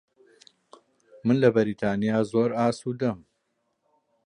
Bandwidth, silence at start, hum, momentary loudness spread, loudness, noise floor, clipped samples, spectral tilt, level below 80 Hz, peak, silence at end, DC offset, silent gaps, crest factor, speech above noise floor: 10.5 kHz; 1.25 s; none; 9 LU; -25 LUFS; -75 dBFS; under 0.1%; -7.5 dB/octave; -64 dBFS; -6 dBFS; 1.1 s; under 0.1%; none; 22 dB; 52 dB